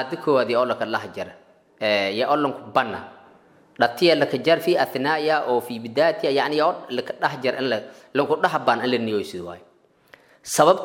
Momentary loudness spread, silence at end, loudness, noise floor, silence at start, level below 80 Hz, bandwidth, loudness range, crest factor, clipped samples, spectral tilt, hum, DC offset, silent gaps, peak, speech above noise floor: 10 LU; 0 s; -22 LUFS; -54 dBFS; 0 s; -70 dBFS; 16.5 kHz; 4 LU; 22 dB; under 0.1%; -4 dB/octave; none; under 0.1%; none; -2 dBFS; 32 dB